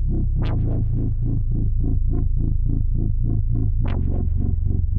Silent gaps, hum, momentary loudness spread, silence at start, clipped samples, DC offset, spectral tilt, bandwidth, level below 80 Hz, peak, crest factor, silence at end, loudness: none; none; 1 LU; 0 s; under 0.1%; under 0.1%; -12 dB/octave; 3.6 kHz; -20 dBFS; -8 dBFS; 10 dB; 0 s; -24 LUFS